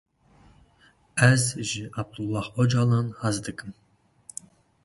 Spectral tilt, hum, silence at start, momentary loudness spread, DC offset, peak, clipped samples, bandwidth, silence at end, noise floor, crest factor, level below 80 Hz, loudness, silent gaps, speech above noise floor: -5 dB/octave; none; 1.15 s; 21 LU; under 0.1%; -4 dBFS; under 0.1%; 11.5 kHz; 1.1 s; -60 dBFS; 22 dB; -56 dBFS; -25 LUFS; none; 36 dB